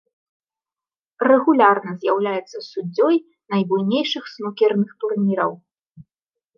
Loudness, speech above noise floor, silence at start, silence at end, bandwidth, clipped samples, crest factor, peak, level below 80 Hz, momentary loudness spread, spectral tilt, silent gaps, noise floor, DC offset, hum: -20 LUFS; over 71 dB; 1.2 s; 0.55 s; 6.8 kHz; under 0.1%; 18 dB; -2 dBFS; -74 dBFS; 12 LU; -7 dB/octave; 5.90-5.95 s; under -90 dBFS; under 0.1%; none